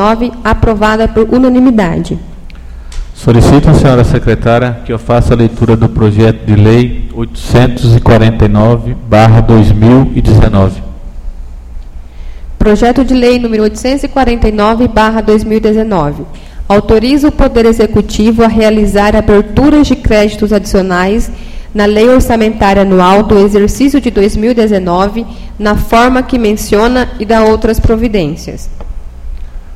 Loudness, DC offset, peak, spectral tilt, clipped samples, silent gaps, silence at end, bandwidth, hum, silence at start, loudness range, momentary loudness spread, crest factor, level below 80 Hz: -8 LUFS; 0.9%; 0 dBFS; -7 dB/octave; 1%; none; 0 s; 15 kHz; none; 0 s; 3 LU; 14 LU; 8 dB; -18 dBFS